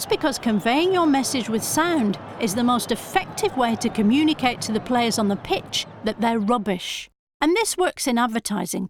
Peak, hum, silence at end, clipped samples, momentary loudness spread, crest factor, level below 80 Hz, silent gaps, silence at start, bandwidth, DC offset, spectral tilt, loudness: -6 dBFS; none; 0 s; under 0.1%; 7 LU; 16 dB; -52 dBFS; 7.19-7.27 s, 7.34-7.40 s; 0 s; 19 kHz; under 0.1%; -4 dB/octave; -22 LUFS